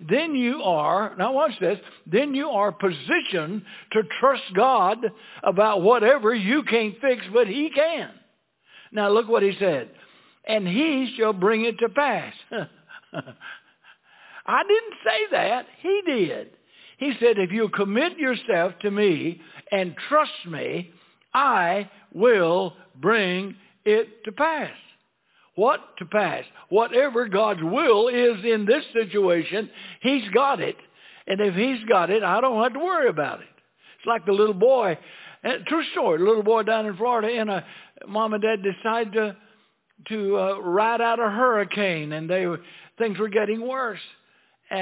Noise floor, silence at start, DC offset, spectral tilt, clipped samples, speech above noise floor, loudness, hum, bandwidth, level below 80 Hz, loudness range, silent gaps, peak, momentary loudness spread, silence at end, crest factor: -64 dBFS; 0 s; under 0.1%; -9 dB/octave; under 0.1%; 41 dB; -23 LUFS; none; 4 kHz; -78 dBFS; 4 LU; none; -4 dBFS; 13 LU; 0 s; 18 dB